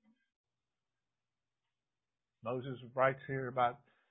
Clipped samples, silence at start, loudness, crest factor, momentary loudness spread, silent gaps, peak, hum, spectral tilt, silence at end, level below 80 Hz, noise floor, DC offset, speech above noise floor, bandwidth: under 0.1%; 2.45 s; -36 LUFS; 24 dB; 11 LU; none; -16 dBFS; none; -2 dB/octave; 0.35 s; -78 dBFS; under -90 dBFS; under 0.1%; over 54 dB; 3.8 kHz